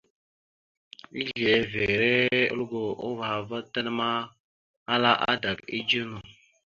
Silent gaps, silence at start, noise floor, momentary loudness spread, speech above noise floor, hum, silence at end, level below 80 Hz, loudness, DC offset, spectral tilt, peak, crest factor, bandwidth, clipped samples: 4.40-4.86 s; 1.15 s; under -90 dBFS; 12 LU; over 63 dB; none; 0.35 s; -58 dBFS; -26 LUFS; under 0.1%; -5.5 dB/octave; -6 dBFS; 22 dB; 7.4 kHz; under 0.1%